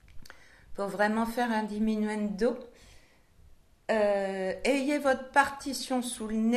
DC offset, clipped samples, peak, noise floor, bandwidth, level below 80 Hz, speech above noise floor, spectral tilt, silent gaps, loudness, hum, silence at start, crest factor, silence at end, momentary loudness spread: under 0.1%; under 0.1%; -8 dBFS; -58 dBFS; 13.5 kHz; -56 dBFS; 30 dB; -4.5 dB/octave; none; -29 LUFS; none; 0.1 s; 22 dB; 0 s; 9 LU